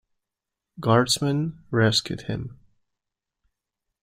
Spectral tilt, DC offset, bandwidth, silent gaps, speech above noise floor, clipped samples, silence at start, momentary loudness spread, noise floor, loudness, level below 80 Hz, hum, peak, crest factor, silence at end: -4.5 dB/octave; under 0.1%; 16 kHz; none; 63 dB; under 0.1%; 0.8 s; 13 LU; -86 dBFS; -23 LUFS; -58 dBFS; none; -4 dBFS; 22 dB; 1.5 s